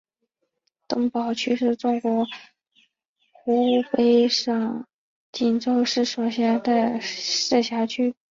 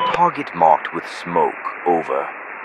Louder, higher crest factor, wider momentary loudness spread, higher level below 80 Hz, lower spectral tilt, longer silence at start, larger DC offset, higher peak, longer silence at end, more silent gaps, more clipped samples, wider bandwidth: second, -22 LUFS vs -19 LUFS; about the same, 16 dB vs 20 dB; about the same, 9 LU vs 11 LU; second, -70 dBFS vs -60 dBFS; second, -3.5 dB/octave vs -5.5 dB/octave; first, 0.9 s vs 0 s; neither; second, -8 dBFS vs 0 dBFS; first, 0.2 s vs 0 s; first, 3.05-3.15 s, 4.93-5.33 s vs none; neither; second, 7.6 kHz vs 10.5 kHz